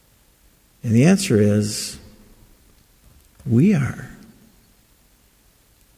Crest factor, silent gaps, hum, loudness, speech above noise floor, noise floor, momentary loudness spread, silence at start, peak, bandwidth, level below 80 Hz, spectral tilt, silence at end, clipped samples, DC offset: 20 dB; none; none; -19 LUFS; 39 dB; -56 dBFS; 21 LU; 0.85 s; -2 dBFS; 16 kHz; -50 dBFS; -6 dB/octave; 1.85 s; under 0.1%; under 0.1%